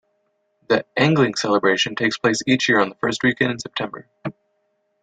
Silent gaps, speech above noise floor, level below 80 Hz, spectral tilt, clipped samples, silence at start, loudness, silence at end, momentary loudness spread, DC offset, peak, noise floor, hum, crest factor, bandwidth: none; 49 dB; -60 dBFS; -4.5 dB/octave; under 0.1%; 0.7 s; -19 LUFS; 0.7 s; 14 LU; under 0.1%; -4 dBFS; -69 dBFS; none; 18 dB; 9.4 kHz